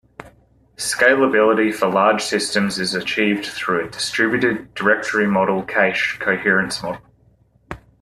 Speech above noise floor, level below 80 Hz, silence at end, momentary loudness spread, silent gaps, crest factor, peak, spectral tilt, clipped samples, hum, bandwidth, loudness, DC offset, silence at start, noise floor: 38 dB; -54 dBFS; 0.25 s; 10 LU; none; 18 dB; -2 dBFS; -4 dB/octave; under 0.1%; none; 14 kHz; -18 LUFS; under 0.1%; 0.2 s; -56 dBFS